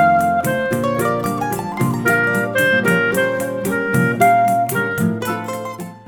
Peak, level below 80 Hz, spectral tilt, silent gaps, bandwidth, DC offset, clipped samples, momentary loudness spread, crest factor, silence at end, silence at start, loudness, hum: -2 dBFS; -52 dBFS; -5.5 dB/octave; none; 19 kHz; under 0.1%; under 0.1%; 9 LU; 14 dB; 0.05 s; 0 s; -17 LUFS; none